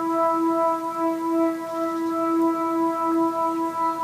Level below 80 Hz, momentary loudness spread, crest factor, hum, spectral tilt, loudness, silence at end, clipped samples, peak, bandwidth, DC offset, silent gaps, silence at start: -70 dBFS; 4 LU; 12 dB; none; -5.5 dB/octave; -23 LUFS; 0 s; under 0.1%; -12 dBFS; 15.5 kHz; under 0.1%; none; 0 s